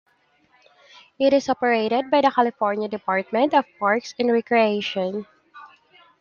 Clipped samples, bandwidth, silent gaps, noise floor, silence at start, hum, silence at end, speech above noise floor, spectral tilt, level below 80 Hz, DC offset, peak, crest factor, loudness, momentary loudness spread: under 0.1%; 7.2 kHz; none; -62 dBFS; 1.2 s; none; 0.55 s; 41 dB; -5 dB/octave; -70 dBFS; under 0.1%; -4 dBFS; 20 dB; -21 LUFS; 6 LU